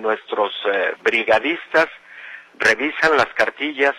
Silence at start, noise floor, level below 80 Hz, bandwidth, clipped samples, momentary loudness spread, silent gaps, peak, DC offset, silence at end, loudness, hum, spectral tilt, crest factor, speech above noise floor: 0 s; -39 dBFS; -58 dBFS; 13 kHz; under 0.1%; 13 LU; none; -4 dBFS; under 0.1%; 0 s; -18 LUFS; none; -3 dB/octave; 16 dB; 20 dB